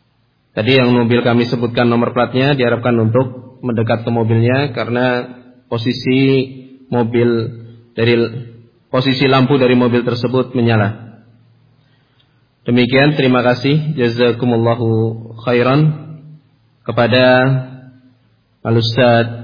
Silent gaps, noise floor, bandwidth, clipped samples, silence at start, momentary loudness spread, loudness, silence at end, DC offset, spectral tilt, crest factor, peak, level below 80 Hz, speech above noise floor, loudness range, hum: none; -59 dBFS; 5.2 kHz; under 0.1%; 0.55 s; 13 LU; -14 LUFS; 0 s; under 0.1%; -8.5 dB/octave; 14 dB; 0 dBFS; -52 dBFS; 45 dB; 3 LU; none